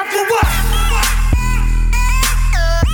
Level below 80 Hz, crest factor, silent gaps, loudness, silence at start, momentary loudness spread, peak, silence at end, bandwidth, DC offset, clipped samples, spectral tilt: -14 dBFS; 8 dB; none; -16 LUFS; 0 s; 3 LU; -4 dBFS; 0 s; 19.5 kHz; under 0.1%; under 0.1%; -3.5 dB/octave